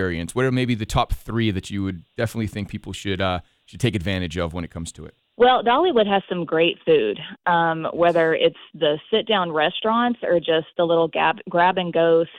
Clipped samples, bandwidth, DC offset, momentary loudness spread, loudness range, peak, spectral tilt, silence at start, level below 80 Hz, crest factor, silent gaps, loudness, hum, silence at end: under 0.1%; 14 kHz; under 0.1%; 10 LU; 6 LU; -4 dBFS; -5.5 dB/octave; 0 s; -44 dBFS; 16 dB; none; -21 LUFS; none; 0 s